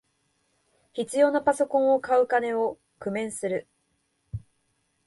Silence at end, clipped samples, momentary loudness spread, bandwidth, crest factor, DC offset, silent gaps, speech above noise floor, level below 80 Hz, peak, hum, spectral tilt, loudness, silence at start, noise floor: 0.65 s; under 0.1%; 18 LU; 11.5 kHz; 18 dB; under 0.1%; none; 49 dB; -58 dBFS; -8 dBFS; none; -5 dB/octave; -25 LUFS; 0.95 s; -73 dBFS